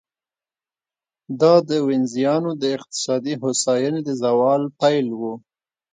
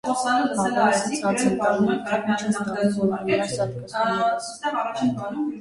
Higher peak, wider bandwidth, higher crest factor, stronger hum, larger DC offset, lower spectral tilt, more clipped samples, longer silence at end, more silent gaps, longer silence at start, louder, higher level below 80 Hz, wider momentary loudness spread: first, -2 dBFS vs -8 dBFS; second, 9.6 kHz vs 11.5 kHz; first, 20 dB vs 14 dB; neither; neither; about the same, -5 dB/octave vs -5 dB/octave; neither; first, 0.55 s vs 0 s; neither; first, 1.3 s vs 0.05 s; first, -20 LUFS vs -23 LUFS; second, -70 dBFS vs -60 dBFS; first, 10 LU vs 6 LU